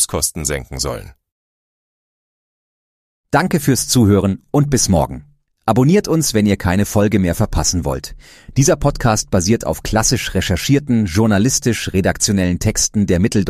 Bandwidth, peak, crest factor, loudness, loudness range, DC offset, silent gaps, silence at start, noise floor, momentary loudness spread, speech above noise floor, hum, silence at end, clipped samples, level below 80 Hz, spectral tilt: 15.5 kHz; 0 dBFS; 16 dB; -16 LUFS; 5 LU; under 0.1%; 1.32-3.24 s; 0 s; under -90 dBFS; 8 LU; over 75 dB; none; 0 s; under 0.1%; -32 dBFS; -4.5 dB/octave